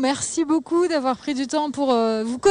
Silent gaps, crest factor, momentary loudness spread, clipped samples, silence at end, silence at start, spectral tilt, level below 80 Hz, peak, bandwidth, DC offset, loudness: none; 14 dB; 4 LU; under 0.1%; 0 s; 0 s; -3.5 dB/octave; -62 dBFS; -6 dBFS; 10 kHz; under 0.1%; -22 LUFS